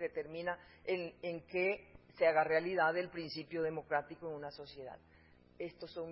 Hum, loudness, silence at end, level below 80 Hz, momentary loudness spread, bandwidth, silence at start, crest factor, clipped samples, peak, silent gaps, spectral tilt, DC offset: none; -38 LUFS; 0 s; -70 dBFS; 16 LU; 5.6 kHz; 0 s; 20 dB; under 0.1%; -18 dBFS; none; -3 dB/octave; under 0.1%